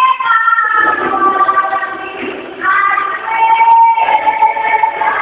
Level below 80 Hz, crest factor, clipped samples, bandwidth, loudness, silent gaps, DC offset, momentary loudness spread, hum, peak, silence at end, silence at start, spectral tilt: -56 dBFS; 12 dB; under 0.1%; 4 kHz; -11 LUFS; none; under 0.1%; 10 LU; none; 0 dBFS; 0 s; 0 s; -6 dB/octave